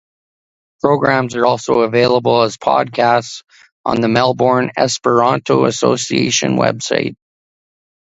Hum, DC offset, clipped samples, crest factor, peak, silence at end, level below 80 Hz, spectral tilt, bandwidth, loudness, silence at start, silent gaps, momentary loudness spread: none; under 0.1%; under 0.1%; 16 dB; 0 dBFS; 0.9 s; -54 dBFS; -4.5 dB/octave; 8.2 kHz; -15 LUFS; 0.85 s; 3.72-3.84 s; 6 LU